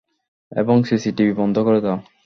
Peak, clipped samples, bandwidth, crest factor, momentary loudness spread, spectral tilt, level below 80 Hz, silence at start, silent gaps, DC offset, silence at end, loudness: -4 dBFS; under 0.1%; 6.6 kHz; 16 dB; 7 LU; -7.5 dB/octave; -56 dBFS; 0.5 s; none; under 0.1%; 0.25 s; -19 LUFS